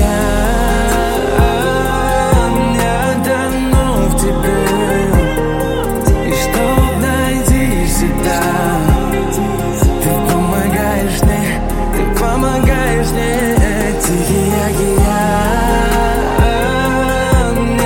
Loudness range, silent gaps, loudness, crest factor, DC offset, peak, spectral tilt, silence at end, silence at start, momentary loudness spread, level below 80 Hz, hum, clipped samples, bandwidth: 1 LU; none; -14 LUFS; 12 dB; under 0.1%; 0 dBFS; -5.5 dB/octave; 0 s; 0 s; 2 LU; -18 dBFS; none; under 0.1%; 17 kHz